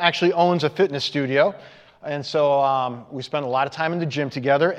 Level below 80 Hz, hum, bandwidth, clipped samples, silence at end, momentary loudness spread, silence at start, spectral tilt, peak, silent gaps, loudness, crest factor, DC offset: -72 dBFS; none; 9.6 kHz; under 0.1%; 0 s; 11 LU; 0 s; -6 dB/octave; -2 dBFS; none; -22 LUFS; 20 dB; under 0.1%